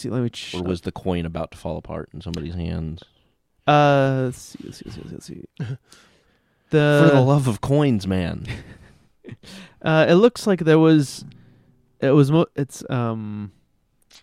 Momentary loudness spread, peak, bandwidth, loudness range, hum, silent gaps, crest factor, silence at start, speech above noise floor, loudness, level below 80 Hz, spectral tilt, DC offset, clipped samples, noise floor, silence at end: 22 LU; -2 dBFS; 13.5 kHz; 6 LU; none; none; 18 dB; 0 s; 44 dB; -20 LUFS; -48 dBFS; -7 dB/octave; under 0.1%; under 0.1%; -64 dBFS; 0.75 s